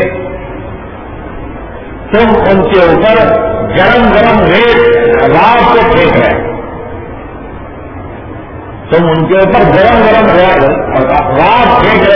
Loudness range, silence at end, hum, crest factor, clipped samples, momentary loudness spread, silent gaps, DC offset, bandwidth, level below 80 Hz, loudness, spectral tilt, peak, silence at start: 6 LU; 0 s; none; 8 dB; 2%; 19 LU; none; under 0.1%; 5.4 kHz; -26 dBFS; -7 LUFS; -8 dB/octave; 0 dBFS; 0 s